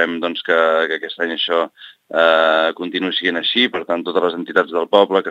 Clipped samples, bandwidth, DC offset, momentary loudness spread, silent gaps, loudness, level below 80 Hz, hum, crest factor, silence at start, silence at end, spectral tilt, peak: under 0.1%; 7.8 kHz; under 0.1%; 8 LU; none; -17 LUFS; -72 dBFS; none; 18 dB; 0 s; 0 s; -5 dB/octave; 0 dBFS